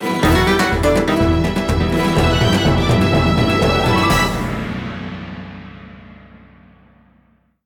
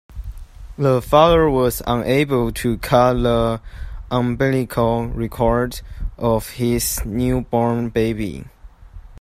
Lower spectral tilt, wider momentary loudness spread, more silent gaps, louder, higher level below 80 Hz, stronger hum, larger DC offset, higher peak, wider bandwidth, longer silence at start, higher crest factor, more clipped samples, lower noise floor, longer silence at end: about the same, -5.5 dB/octave vs -6 dB/octave; about the same, 15 LU vs 16 LU; neither; first, -16 LUFS vs -19 LUFS; about the same, -28 dBFS vs -32 dBFS; neither; neither; second, -4 dBFS vs 0 dBFS; first, 19.5 kHz vs 15 kHz; about the same, 0 s vs 0.1 s; second, 12 dB vs 18 dB; neither; first, -56 dBFS vs -39 dBFS; first, 1.6 s vs 0.05 s